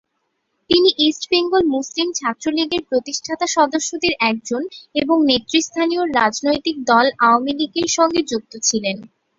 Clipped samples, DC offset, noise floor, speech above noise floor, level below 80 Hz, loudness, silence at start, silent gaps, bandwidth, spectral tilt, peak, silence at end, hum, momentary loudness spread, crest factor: under 0.1%; under 0.1%; -71 dBFS; 53 dB; -54 dBFS; -18 LUFS; 0.7 s; none; 7.8 kHz; -2 dB/octave; 0 dBFS; 0.3 s; none; 8 LU; 18 dB